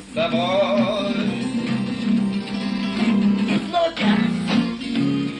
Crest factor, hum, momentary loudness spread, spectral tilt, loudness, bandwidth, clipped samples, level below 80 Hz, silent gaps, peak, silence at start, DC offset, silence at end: 14 dB; none; 5 LU; -6.5 dB/octave; -21 LUFS; 10.5 kHz; under 0.1%; -52 dBFS; none; -8 dBFS; 0 s; under 0.1%; 0 s